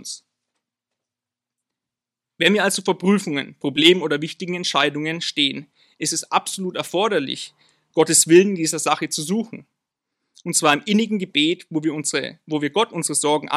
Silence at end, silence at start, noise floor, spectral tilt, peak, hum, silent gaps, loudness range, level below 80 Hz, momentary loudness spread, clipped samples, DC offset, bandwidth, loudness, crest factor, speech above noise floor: 0 s; 0 s; -87 dBFS; -3 dB/octave; 0 dBFS; none; none; 4 LU; -74 dBFS; 12 LU; under 0.1%; under 0.1%; 15 kHz; -20 LUFS; 20 dB; 67 dB